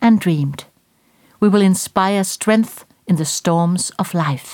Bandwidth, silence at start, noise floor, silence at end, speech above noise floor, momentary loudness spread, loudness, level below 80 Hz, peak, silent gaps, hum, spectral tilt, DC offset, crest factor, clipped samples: 18 kHz; 0 s; -58 dBFS; 0 s; 42 dB; 8 LU; -17 LUFS; -58 dBFS; 0 dBFS; none; none; -5.5 dB/octave; under 0.1%; 16 dB; under 0.1%